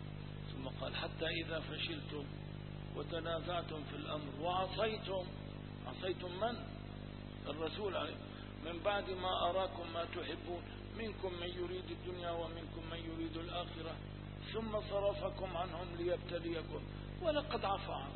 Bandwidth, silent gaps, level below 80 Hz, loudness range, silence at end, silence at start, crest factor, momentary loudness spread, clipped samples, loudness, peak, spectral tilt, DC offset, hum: 4.3 kHz; none; -54 dBFS; 4 LU; 0 s; 0 s; 18 dB; 10 LU; under 0.1%; -42 LUFS; -22 dBFS; -4 dB/octave; under 0.1%; 50 Hz at -50 dBFS